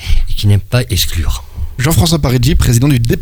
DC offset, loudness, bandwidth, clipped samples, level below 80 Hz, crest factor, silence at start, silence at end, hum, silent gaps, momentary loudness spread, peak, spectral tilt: under 0.1%; -13 LUFS; 19.5 kHz; under 0.1%; -16 dBFS; 10 dB; 0 s; 0 s; none; none; 9 LU; 0 dBFS; -5 dB/octave